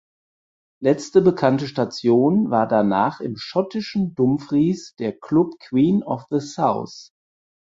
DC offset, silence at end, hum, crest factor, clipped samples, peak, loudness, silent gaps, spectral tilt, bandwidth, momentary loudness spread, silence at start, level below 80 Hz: under 0.1%; 0.65 s; none; 18 dB; under 0.1%; -2 dBFS; -20 LUFS; none; -7 dB/octave; 7.8 kHz; 9 LU; 0.8 s; -60 dBFS